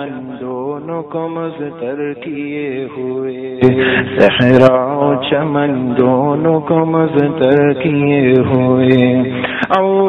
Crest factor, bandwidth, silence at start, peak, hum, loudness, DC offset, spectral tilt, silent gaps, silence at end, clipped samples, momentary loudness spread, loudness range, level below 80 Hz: 14 dB; 6.2 kHz; 0 s; 0 dBFS; none; -14 LUFS; under 0.1%; -8.5 dB/octave; none; 0 s; 0.4%; 12 LU; 7 LU; -48 dBFS